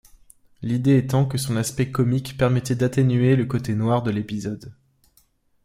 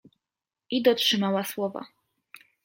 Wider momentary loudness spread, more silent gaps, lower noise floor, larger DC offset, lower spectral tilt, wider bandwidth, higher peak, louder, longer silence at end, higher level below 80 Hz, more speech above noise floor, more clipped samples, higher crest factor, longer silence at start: about the same, 10 LU vs 11 LU; neither; second, -62 dBFS vs -90 dBFS; neither; first, -7 dB/octave vs -4 dB/octave; about the same, 15.5 kHz vs 16.5 kHz; about the same, -6 dBFS vs -8 dBFS; first, -22 LUFS vs -25 LUFS; about the same, 0.9 s vs 0.8 s; first, -52 dBFS vs -76 dBFS; second, 41 dB vs 65 dB; neither; about the same, 16 dB vs 20 dB; about the same, 0.6 s vs 0.7 s